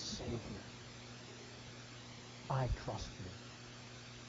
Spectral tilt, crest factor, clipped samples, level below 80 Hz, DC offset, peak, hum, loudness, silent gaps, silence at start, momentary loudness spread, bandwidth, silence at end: -4.5 dB/octave; 22 dB; under 0.1%; -54 dBFS; under 0.1%; -24 dBFS; none; -46 LUFS; none; 0 s; 12 LU; 7.6 kHz; 0 s